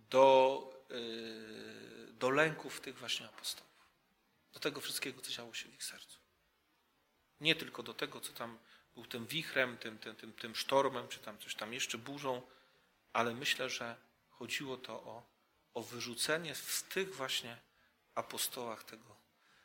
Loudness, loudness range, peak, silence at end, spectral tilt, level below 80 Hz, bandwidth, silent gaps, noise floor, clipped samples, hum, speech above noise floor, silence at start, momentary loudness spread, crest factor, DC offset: -37 LUFS; 4 LU; -14 dBFS; 0.5 s; -2.5 dB/octave; -82 dBFS; 16.5 kHz; none; -77 dBFS; under 0.1%; none; 36 dB; 0.1 s; 17 LU; 26 dB; under 0.1%